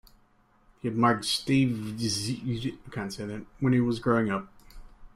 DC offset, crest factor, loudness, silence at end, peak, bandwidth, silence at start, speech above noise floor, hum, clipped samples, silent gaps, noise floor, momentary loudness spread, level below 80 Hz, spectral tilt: under 0.1%; 18 dB; -28 LUFS; 0.05 s; -12 dBFS; 15 kHz; 0.85 s; 36 dB; none; under 0.1%; none; -63 dBFS; 12 LU; -54 dBFS; -5.5 dB/octave